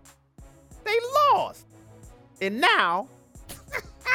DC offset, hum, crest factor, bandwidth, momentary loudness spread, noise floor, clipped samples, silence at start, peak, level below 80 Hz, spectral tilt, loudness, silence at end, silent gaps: under 0.1%; none; 20 dB; 17.5 kHz; 19 LU; -51 dBFS; under 0.1%; 0.4 s; -6 dBFS; -54 dBFS; -3 dB/octave; -24 LUFS; 0 s; none